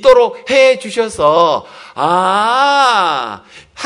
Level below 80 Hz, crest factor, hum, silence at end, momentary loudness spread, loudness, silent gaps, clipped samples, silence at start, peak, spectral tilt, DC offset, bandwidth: -48 dBFS; 12 dB; none; 0 s; 10 LU; -12 LUFS; none; 0.5%; 0 s; 0 dBFS; -3 dB/octave; under 0.1%; 11 kHz